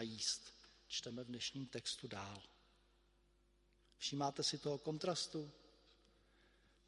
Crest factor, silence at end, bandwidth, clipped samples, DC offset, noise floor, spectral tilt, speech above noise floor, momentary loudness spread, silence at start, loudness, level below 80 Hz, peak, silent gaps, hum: 22 dB; 0.95 s; 11.5 kHz; under 0.1%; under 0.1%; -75 dBFS; -3 dB/octave; 30 dB; 13 LU; 0 s; -44 LUFS; -76 dBFS; -26 dBFS; none; none